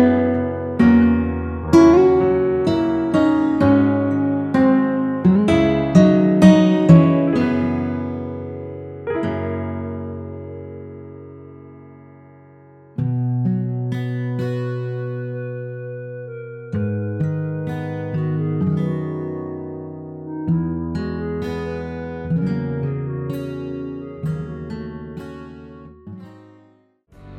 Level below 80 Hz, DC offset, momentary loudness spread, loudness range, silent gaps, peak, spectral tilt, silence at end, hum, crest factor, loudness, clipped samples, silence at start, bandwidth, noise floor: -42 dBFS; under 0.1%; 20 LU; 15 LU; none; 0 dBFS; -8.5 dB/octave; 0 s; none; 18 dB; -19 LUFS; under 0.1%; 0 s; 9.4 kHz; -55 dBFS